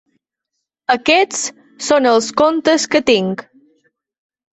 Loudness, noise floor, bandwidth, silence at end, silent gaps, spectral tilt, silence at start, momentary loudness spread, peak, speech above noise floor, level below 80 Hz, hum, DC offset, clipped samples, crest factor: -15 LUFS; -77 dBFS; 8.4 kHz; 1.1 s; none; -3 dB/octave; 0.9 s; 12 LU; 0 dBFS; 62 dB; -56 dBFS; none; under 0.1%; under 0.1%; 16 dB